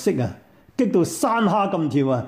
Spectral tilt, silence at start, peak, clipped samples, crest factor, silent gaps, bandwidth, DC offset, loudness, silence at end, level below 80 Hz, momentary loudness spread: -6.5 dB/octave; 0 s; -8 dBFS; under 0.1%; 12 dB; none; 16 kHz; under 0.1%; -21 LUFS; 0 s; -60 dBFS; 8 LU